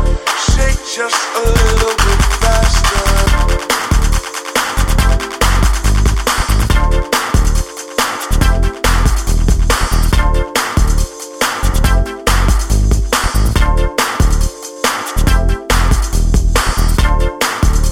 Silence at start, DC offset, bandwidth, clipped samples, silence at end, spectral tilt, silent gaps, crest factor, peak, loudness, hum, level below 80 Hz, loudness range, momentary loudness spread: 0 s; under 0.1%; 16.5 kHz; under 0.1%; 0 s; -4 dB/octave; none; 12 dB; 0 dBFS; -14 LUFS; none; -14 dBFS; 2 LU; 4 LU